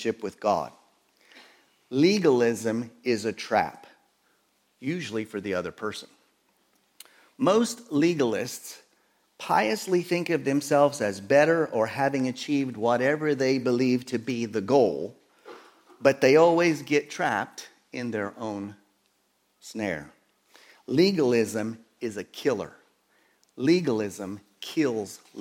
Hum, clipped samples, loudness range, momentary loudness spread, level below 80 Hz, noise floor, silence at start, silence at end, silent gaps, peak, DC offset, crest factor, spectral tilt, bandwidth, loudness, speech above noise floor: none; under 0.1%; 8 LU; 15 LU; -72 dBFS; -70 dBFS; 0 s; 0 s; none; -6 dBFS; under 0.1%; 22 dB; -5 dB/octave; 17 kHz; -26 LUFS; 45 dB